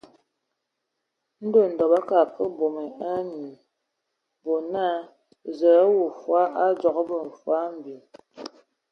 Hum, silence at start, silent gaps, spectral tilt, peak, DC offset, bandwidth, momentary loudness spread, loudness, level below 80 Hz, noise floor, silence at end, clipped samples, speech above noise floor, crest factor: none; 1.4 s; none; -7 dB/octave; -8 dBFS; under 0.1%; 6.4 kHz; 21 LU; -23 LUFS; -74 dBFS; -80 dBFS; 0.45 s; under 0.1%; 58 dB; 18 dB